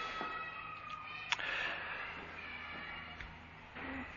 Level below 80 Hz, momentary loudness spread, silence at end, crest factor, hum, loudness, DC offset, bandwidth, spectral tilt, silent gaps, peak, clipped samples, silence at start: -62 dBFS; 11 LU; 0 s; 30 dB; none; -42 LUFS; under 0.1%; 7 kHz; -0.5 dB/octave; none; -14 dBFS; under 0.1%; 0 s